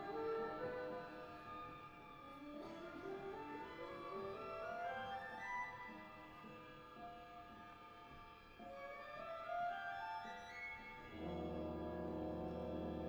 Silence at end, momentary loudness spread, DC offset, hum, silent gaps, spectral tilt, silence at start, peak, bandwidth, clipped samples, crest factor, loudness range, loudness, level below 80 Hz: 0 s; 12 LU; under 0.1%; none; none; -6.5 dB/octave; 0 s; -34 dBFS; over 20 kHz; under 0.1%; 14 dB; 6 LU; -49 LUFS; -66 dBFS